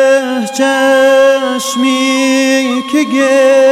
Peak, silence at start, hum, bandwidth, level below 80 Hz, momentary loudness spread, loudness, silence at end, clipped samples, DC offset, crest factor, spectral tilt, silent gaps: 0 dBFS; 0 s; none; 15 kHz; -62 dBFS; 6 LU; -10 LUFS; 0 s; under 0.1%; under 0.1%; 10 dB; -2.5 dB/octave; none